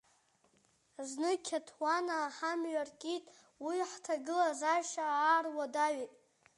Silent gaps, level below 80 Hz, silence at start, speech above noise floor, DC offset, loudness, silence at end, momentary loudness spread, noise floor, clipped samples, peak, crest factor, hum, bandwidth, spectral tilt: none; -90 dBFS; 1 s; 37 dB; under 0.1%; -35 LUFS; 0.45 s; 11 LU; -72 dBFS; under 0.1%; -18 dBFS; 18 dB; none; 11.5 kHz; -1 dB/octave